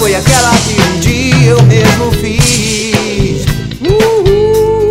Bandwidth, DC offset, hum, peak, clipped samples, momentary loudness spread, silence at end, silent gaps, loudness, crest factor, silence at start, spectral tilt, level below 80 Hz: 16.5 kHz; under 0.1%; none; 0 dBFS; 0.4%; 7 LU; 0 s; none; -9 LUFS; 8 dB; 0 s; -4.5 dB/octave; -22 dBFS